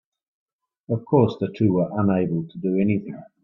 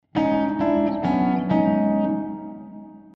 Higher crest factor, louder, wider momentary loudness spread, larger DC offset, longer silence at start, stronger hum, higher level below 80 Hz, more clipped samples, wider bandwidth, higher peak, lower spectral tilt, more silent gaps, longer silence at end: first, 20 dB vs 14 dB; about the same, -22 LUFS vs -22 LUFS; second, 9 LU vs 18 LU; neither; first, 0.9 s vs 0.15 s; neither; second, -60 dBFS vs -52 dBFS; neither; about the same, 6 kHz vs 6 kHz; first, -4 dBFS vs -8 dBFS; about the same, -10.5 dB/octave vs -9.5 dB/octave; neither; about the same, 0.2 s vs 0.15 s